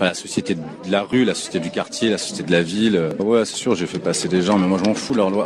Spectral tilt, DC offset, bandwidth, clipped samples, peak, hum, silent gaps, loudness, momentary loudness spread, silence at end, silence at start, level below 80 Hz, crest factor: -4.5 dB/octave; under 0.1%; 13 kHz; under 0.1%; -2 dBFS; none; none; -20 LUFS; 7 LU; 0 s; 0 s; -58 dBFS; 16 dB